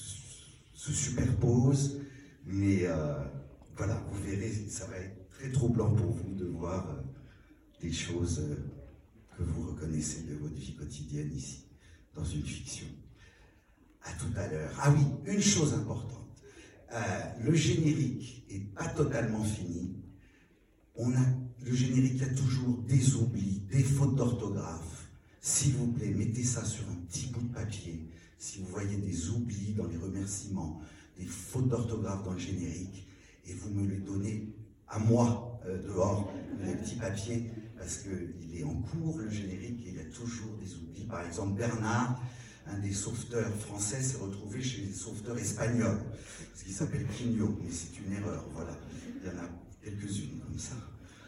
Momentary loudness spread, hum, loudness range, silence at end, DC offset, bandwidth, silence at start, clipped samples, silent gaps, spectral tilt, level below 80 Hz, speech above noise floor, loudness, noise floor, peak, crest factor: 17 LU; none; 8 LU; 0 s; under 0.1%; 12.5 kHz; 0 s; under 0.1%; none; -5.5 dB/octave; -52 dBFS; 32 dB; -34 LUFS; -65 dBFS; -12 dBFS; 20 dB